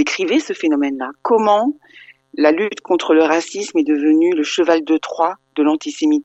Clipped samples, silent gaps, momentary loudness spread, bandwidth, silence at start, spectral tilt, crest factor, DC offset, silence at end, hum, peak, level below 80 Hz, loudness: under 0.1%; none; 7 LU; 8.2 kHz; 0 s; -3.5 dB/octave; 16 dB; under 0.1%; 0 s; none; 0 dBFS; -64 dBFS; -17 LUFS